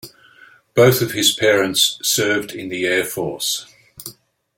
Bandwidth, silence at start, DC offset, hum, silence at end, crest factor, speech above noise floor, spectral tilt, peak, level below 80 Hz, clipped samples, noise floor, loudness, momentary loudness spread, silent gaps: 17 kHz; 0.05 s; under 0.1%; none; 0.45 s; 20 dB; 31 dB; -3 dB/octave; 0 dBFS; -58 dBFS; under 0.1%; -49 dBFS; -17 LUFS; 17 LU; none